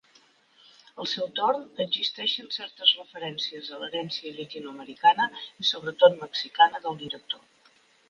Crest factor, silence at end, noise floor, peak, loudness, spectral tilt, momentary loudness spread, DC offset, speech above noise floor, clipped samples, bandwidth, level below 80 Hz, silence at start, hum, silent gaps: 22 dB; 0.7 s; -61 dBFS; -6 dBFS; -26 LUFS; -3 dB/octave; 15 LU; under 0.1%; 34 dB; under 0.1%; 7.2 kHz; -78 dBFS; 0.95 s; none; none